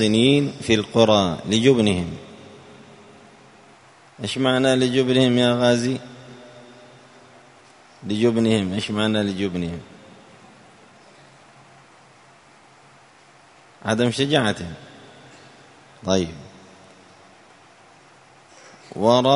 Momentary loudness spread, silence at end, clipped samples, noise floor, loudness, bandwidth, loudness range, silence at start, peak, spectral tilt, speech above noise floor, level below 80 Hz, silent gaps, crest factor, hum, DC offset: 21 LU; 0 s; under 0.1%; -51 dBFS; -20 LUFS; 11 kHz; 11 LU; 0 s; 0 dBFS; -5.5 dB/octave; 32 dB; -56 dBFS; none; 22 dB; none; under 0.1%